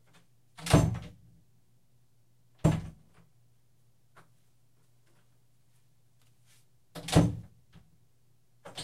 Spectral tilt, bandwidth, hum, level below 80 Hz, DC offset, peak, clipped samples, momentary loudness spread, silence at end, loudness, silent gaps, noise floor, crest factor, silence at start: -6 dB/octave; 15 kHz; none; -48 dBFS; under 0.1%; -8 dBFS; under 0.1%; 24 LU; 0 s; -29 LUFS; none; -70 dBFS; 26 dB; 0.6 s